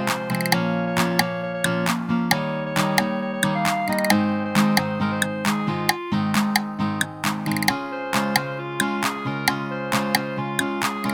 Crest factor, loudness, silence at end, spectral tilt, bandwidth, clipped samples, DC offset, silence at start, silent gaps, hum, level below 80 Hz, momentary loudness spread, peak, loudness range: 22 dB; -23 LUFS; 0 s; -4.5 dB/octave; over 20 kHz; under 0.1%; under 0.1%; 0 s; none; none; -58 dBFS; 4 LU; 0 dBFS; 2 LU